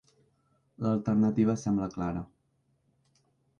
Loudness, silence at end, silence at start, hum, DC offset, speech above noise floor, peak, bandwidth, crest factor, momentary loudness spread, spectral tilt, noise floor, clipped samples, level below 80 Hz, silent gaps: -29 LUFS; 1.35 s; 0.8 s; none; under 0.1%; 45 dB; -14 dBFS; 7.2 kHz; 16 dB; 11 LU; -8.5 dB/octave; -73 dBFS; under 0.1%; -58 dBFS; none